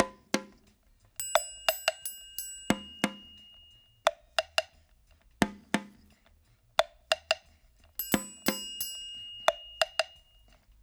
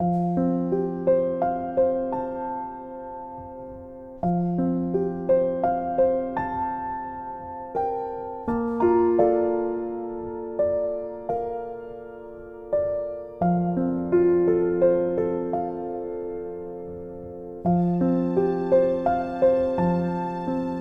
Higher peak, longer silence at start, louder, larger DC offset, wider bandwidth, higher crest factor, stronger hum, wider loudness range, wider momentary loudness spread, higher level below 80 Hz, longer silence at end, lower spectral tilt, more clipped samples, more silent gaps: about the same, -8 dBFS vs -8 dBFS; about the same, 0 s vs 0 s; second, -32 LUFS vs -25 LUFS; neither; first, over 20 kHz vs 4.7 kHz; first, 26 dB vs 16 dB; neither; second, 2 LU vs 5 LU; second, 11 LU vs 16 LU; second, -62 dBFS vs -52 dBFS; first, 0.7 s vs 0 s; second, -2.5 dB/octave vs -11 dB/octave; neither; neither